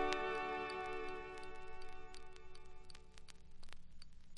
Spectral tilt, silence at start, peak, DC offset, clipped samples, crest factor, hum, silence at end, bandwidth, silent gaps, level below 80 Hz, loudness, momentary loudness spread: -4 dB/octave; 0 s; -16 dBFS; under 0.1%; under 0.1%; 28 dB; none; 0 s; 11 kHz; none; -58 dBFS; -45 LUFS; 21 LU